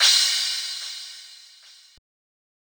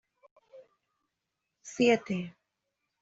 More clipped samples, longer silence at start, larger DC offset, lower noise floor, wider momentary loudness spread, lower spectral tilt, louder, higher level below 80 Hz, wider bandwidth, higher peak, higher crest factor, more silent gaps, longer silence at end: neither; second, 0 s vs 0.55 s; neither; second, -51 dBFS vs -85 dBFS; first, 24 LU vs 20 LU; second, 7 dB/octave vs -5 dB/octave; first, -21 LUFS vs -28 LUFS; about the same, -78 dBFS vs -74 dBFS; first, over 20 kHz vs 8 kHz; first, -4 dBFS vs -12 dBFS; about the same, 22 dB vs 22 dB; neither; first, 1.35 s vs 0.75 s